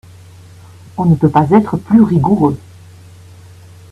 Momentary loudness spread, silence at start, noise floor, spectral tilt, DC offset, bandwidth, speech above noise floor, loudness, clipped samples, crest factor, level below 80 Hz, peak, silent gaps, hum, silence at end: 9 LU; 0.95 s; -38 dBFS; -9.5 dB/octave; under 0.1%; 11 kHz; 27 dB; -12 LUFS; under 0.1%; 14 dB; -46 dBFS; 0 dBFS; none; none; 1.35 s